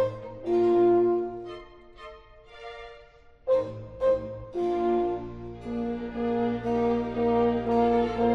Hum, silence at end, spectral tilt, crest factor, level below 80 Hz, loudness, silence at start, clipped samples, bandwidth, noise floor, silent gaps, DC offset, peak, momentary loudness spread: none; 0 s; -8.5 dB/octave; 14 dB; -50 dBFS; -26 LUFS; 0 s; under 0.1%; 6.2 kHz; -53 dBFS; none; under 0.1%; -12 dBFS; 21 LU